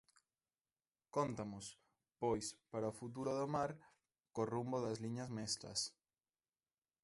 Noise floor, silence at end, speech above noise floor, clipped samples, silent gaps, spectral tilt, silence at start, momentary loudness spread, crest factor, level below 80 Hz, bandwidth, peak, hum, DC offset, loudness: under -90 dBFS; 1.15 s; over 47 dB; under 0.1%; none; -4.5 dB/octave; 1.15 s; 7 LU; 20 dB; -74 dBFS; 11.5 kHz; -24 dBFS; none; under 0.1%; -43 LUFS